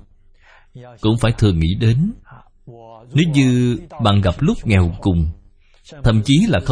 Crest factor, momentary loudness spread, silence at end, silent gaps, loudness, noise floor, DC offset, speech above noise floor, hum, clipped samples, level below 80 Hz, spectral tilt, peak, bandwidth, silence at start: 16 dB; 6 LU; 0 s; none; -17 LUFS; -48 dBFS; under 0.1%; 32 dB; none; under 0.1%; -32 dBFS; -7 dB/octave; 0 dBFS; 10.5 kHz; 0.75 s